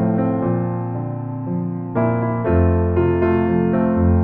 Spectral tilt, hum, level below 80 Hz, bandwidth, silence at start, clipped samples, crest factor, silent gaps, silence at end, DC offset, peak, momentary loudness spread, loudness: -13 dB/octave; none; -34 dBFS; 3.4 kHz; 0 s; under 0.1%; 12 dB; none; 0 s; under 0.1%; -4 dBFS; 8 LU; -19 LUFS